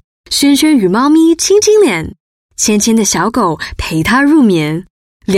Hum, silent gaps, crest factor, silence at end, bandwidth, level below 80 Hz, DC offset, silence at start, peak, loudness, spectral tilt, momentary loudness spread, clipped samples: none; 2.20-2.49 s, 4.90-5.20 s; 10 dB; 0 s; 16 kHz; -36 dBFS; under 0.1%; 0.3 s; 0 dBFS; -10 LUFS; -4 dB/octave; 11 LU; under 0.1%